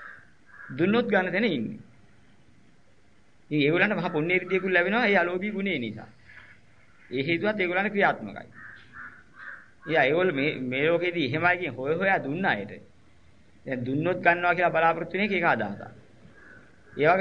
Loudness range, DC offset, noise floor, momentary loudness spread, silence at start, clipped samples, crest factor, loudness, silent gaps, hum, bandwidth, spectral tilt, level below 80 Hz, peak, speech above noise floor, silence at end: 4 LU; 0.2%; -62 dBFS; 21 LU; 0 s; under 0.1%; 22 dB; -25 LUFS; none; none; 6.8 kHz; -7.5 dB/octave; -66 dBFS; -4 dBFS; 36 dB; 0 s